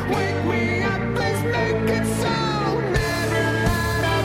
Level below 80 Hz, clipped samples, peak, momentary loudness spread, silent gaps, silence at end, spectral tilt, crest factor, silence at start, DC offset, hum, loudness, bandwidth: -36 dBFS; under 0.1%; -8 dBFS; 2 LU; none; 0 s; -5.5 dB/octave; 12 dB; 0 s; under 0.1%; none; -22 LUFS; 16.5 kHz